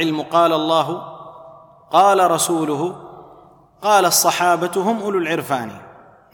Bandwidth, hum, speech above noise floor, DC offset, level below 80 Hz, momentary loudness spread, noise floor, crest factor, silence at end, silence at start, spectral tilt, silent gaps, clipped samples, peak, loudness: 19 kHz; none; 30 dB; under 0.1%; -66 dBFS; 14 LU; -47 dBFS; 16 dB; 0.4 s; 0 s; -3 dB/octave; none; under 0.1%; -2 dBFS; -17 LUFS